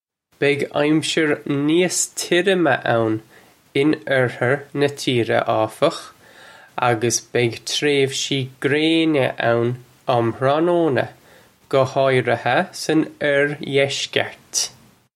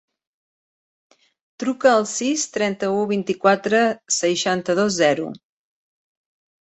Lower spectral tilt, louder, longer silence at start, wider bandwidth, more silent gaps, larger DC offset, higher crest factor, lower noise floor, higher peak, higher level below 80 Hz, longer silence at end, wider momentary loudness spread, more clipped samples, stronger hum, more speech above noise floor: about the same, -4 dB/octave vs -3.5 dB/octave; about the same, -19 LUFS vs -20 LUFS; second, 0.4 s vs 1.6 s; first, 15.5 kHz vs 8.4 kHz; neither; neither; about the same, 18 dB vs 20 dB; second, -51 dBFS vs under -90 dBFS; about the same, 0 dBFS vs -2 dBFS; about the same, -64 dBFS vs -66 dBFS; second, 0.45 s vs 1.3 s; about the same, 5 LU vs 6 LU; neither; neither; second, 32 dB vs over 70 dB